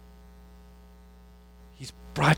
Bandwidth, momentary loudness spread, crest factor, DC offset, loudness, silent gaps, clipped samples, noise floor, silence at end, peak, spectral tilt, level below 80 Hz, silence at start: 16.5 kHz; 17 LU; 24 dB; under 0.1%; -33 LUFS; none; under 0.1%; -52 dBFS; 0 s; -8 dBFS; -5.5 dB/octave; -50 dBFS; 1.8 s